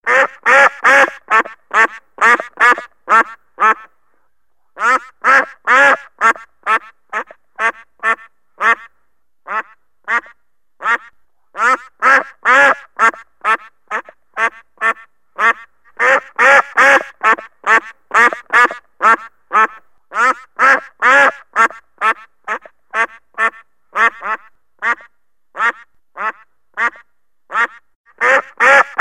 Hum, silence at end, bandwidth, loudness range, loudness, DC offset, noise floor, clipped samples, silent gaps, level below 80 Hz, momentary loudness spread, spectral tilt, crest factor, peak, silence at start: none; 0 s; 15.5 kHz; 8 LU; -14 LUFS; 0.2%; -69 dBFS; under 0.1%; 27.95-28.04 s; -68 dBFS; 14 LU; -1 dB/octave; 16 dB; 0 dBFS; 0.05 s